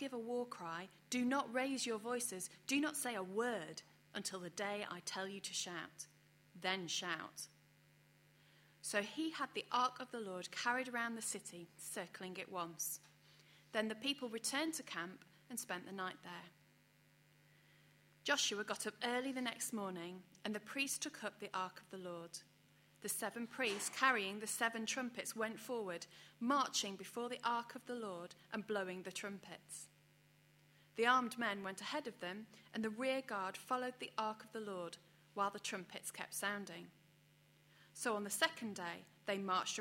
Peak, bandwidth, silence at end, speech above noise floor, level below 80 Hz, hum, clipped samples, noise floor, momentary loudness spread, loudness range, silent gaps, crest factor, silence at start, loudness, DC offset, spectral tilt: -18 dBFS; 16.5 kHz; 0 s; 28 dB; -88 dBFS; none; under 0.1%; -71 dBFS; 13 LU; 5 LU; none; 26 dB; 0 s; -42 LUFS; under 0.1%; -2 dB/octave